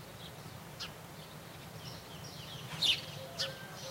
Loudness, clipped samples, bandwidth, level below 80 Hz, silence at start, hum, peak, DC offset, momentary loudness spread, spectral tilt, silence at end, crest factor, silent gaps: -38 LUFS; under 0.1%; 16 kHz; -66 dBFS; 0 s; none; -18 dBFS; under 0.1%; 18 LU; -2.5 dB/octave; 0 s; 24 dB; none